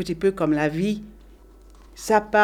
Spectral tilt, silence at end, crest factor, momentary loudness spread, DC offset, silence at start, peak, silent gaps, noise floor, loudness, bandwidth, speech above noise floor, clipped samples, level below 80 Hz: -5.5 dB/octave; 0 s; 20 dB; 10 LU; under 0.1%; 0 s; -4 dBFS; none; -48 dBFS; -23 LUFS; 16 kHz; 27 dB; under 0.1%; -48 dBFS